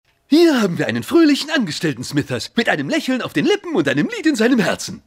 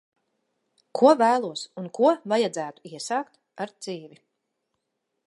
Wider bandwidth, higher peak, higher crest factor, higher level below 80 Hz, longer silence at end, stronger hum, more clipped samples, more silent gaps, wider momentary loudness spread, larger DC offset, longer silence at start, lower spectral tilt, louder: first, 16 kHz vs 11.5 kHz; about the same, -2 dBFS vs -4 dBFS; second, 14 dB vs 22 dB; first, -60 dBFS vs -84 dBFS; second, 0.1 s vs 1.2 s; neither; neither; neither; second, 7 LU vs 18 LU; neither; second, 0.3 s vs 0.95 s; about the same, -5 dB/octave vs -4.5 dB/octave; first, -17 LUFS vs -23 LUFS